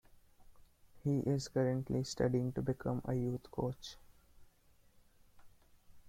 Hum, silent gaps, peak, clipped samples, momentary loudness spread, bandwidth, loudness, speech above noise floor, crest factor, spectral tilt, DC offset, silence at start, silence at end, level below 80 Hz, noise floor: none; none; -20 dBFS; under 0.1%; 7 LU; 15.5 kHz; -37 LUFS; 31 dB; 20 dB; -7 dB/octave; under 0.1%; 0.4 s; 0 s; -62 dBFS; -67 dBFS